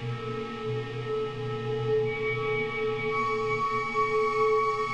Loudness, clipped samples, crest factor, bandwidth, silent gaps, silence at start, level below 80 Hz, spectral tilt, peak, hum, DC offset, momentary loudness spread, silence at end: -28 LUFS; under 0.1%; 14 dB; 9 kHz; none; 0 s; -54 dBFS; -6 dB/octave; -16 dBFS; none; 0.3%; 8 LU; 0 s